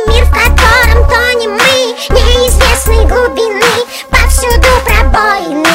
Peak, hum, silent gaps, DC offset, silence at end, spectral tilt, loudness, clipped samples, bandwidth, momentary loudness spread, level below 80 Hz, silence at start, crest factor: 0 dBFS; none; none; under 0.1%; 0 s; -3.5 dB/octave; -8 LUFS; 2%; 16.5 kHz; 4 LU; -10 dBFS; 0 s; 8 dB